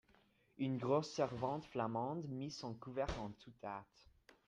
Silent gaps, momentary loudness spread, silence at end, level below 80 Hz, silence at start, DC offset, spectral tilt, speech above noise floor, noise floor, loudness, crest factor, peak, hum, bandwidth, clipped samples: none; 12 LU; 0.65 s; -62 dBFS; 0.6 s; under 0.1%; -6.5 dB/octave; 31 dB; -73 dBFS; -43 LUFS; 20 dB; -24 dBFS; none; 10 kHz; under 0.1%